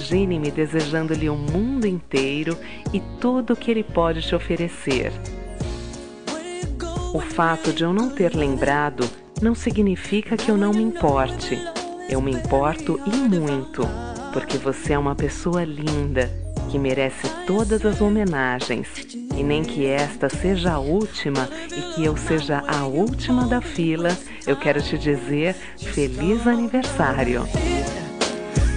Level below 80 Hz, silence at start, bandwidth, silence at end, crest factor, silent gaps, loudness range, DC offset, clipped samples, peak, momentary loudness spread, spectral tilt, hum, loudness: -34 dBFS; 0 s; 10 kHz; 0 s; 18 dB; none; 3 LU; 1%; under 0.1%; -4 dBFS; 8 LU; -6 dB/octave; none; -23 LUFS